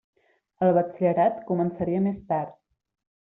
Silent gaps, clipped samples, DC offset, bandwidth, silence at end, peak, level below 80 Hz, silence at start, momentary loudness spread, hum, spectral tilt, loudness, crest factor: none; under 0.1%; under 0.1%; 3.8 kHz; 0.7 s; -10 dBFS; -62 dBFS; 0.6 s; 7 LU; none; -9 dB/octave; -25 LUFS; 16 dB